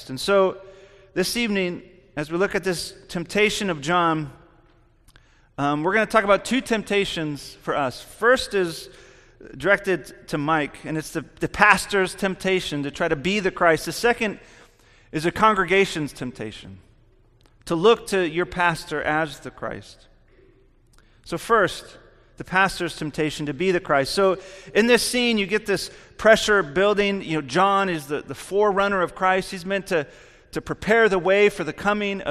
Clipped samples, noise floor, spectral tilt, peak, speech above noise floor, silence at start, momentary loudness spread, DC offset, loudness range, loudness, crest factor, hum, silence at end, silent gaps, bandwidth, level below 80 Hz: under 0.1%; -56 dBFS; -4.5 dB/octave; 0 dBFS; 34 dB; 0 s; 14 LU; under 0.1%; 5 LU; -22 LUFS; 22 dB; none; 0 s; none; 14.5 kHz; -50 dBFS